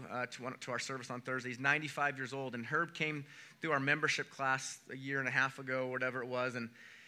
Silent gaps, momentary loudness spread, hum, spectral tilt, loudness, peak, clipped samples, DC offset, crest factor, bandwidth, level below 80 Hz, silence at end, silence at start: none; 11 LU; none; -4 dB/octave; -37 LUFS; -16 dBFS; under 0.1%; under 0.1%; 22 dB; 15.5 kHz; under -90 dBFS; 0 s; 0 s